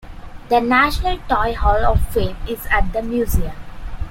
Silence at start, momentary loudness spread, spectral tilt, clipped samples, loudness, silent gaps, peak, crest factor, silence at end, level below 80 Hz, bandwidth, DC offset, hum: 0.05 s; 15 LU; -5.5 dB/octave; under 0.1%; -19 LUFS; none; -2 dBFS; 16 dB; 0 s; -24 dBFS; 17 kHz; under 0.1%; none